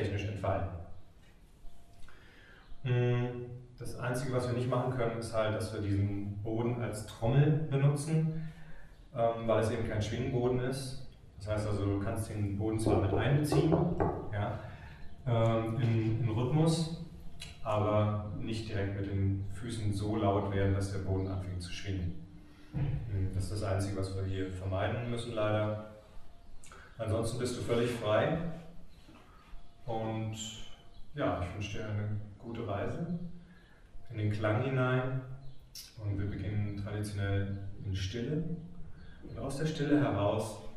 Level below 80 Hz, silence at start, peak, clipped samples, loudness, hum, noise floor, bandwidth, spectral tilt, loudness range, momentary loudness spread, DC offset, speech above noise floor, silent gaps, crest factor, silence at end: -50 dBFS; 0 s; -14 dBFS; under 0.1%; -34 LUFS; none; -57 dBFS; 13 kHz; -7 dB/octave; 6 LU; 17 LU; under 0.1%; 25 dB; none; 20 dB; 0 s